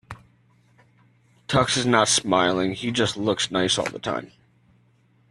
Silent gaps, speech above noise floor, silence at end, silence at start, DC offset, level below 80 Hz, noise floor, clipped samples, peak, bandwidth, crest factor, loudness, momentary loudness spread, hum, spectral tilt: none; 38 dB; 1.05 s; 0.1 s; under 0.1%; -56 dBFS; -61 dBFS; under 0.1%; -2 dBFS; 12.5 kHz; 22 dB; -22 LUFS; 13 LU; none; -3.5 dB/octave